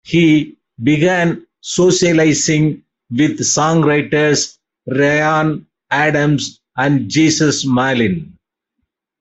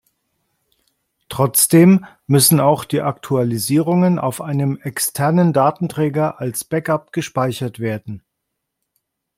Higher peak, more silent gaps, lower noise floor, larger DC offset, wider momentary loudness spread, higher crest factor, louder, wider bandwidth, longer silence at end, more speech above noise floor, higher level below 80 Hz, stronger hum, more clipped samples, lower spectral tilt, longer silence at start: about the same, -2 dBFS vs 0 dBFS; neither; second, -73 dBFS vs -77 dBFS; neither; about the same, 11 LU vs 12 LU; about the same, 14 dB vs 16 dB; first, -14 LUFS vs -17 LUFS; second, 8.4 kHz vs 16.5 kHz; second, 0.95 s vs 1.2 s; about the same, 60 dB vs 61 dB; first, -52 dBFS vs -58 dBFS; neither; neither; about the same, -4.5 dB/octave vs -5.5 dB/octave; second, 0.05 s vs 1.3 s